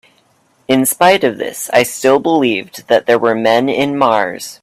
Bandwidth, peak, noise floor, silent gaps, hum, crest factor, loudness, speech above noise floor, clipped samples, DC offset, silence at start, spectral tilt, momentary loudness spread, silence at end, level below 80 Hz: 16 kHz; 0 dBFS; -55 dBFS; none; none; 14 dB; -13 LUFS; 42 dB; under 0.1%; under 0.1%; 0.7 s; -3.5 dB/octave; 6 LU; 0.1 s; -58 dBFS